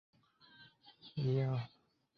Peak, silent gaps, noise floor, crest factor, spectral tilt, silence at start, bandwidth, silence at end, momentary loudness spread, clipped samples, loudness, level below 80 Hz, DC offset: -24 dBFS; none; -64 dBFS; 16 dB; -7.5 dB/octave; 0.6 s; 6 kHz; 0.5 s; 25 LU; under 0.1%; -38 LUFS; -74 dBFS; under 0.1%